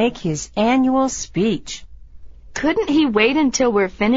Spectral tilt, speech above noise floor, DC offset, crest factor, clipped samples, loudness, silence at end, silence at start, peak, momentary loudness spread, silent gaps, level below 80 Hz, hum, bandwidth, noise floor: -4 dB/octave; 20 dB; under 0.1%; 16 dB; under 0.1%; -18 LUFS; 0 s; 0 s; -2 dBFS; 10 LU; none; -42 dBFS; none; 8 kHz; -37 dBFS